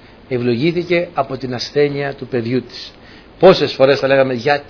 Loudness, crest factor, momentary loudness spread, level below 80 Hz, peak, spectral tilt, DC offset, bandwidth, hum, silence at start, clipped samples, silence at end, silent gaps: -16 LUFS; 16 dB; 12 LU; -48 dBFS; 0 dBFS; -6.5 dB/octave; under 0.1%; 5.4 kHz; none; 0.3 s; under 0.1%; 0.05 s; none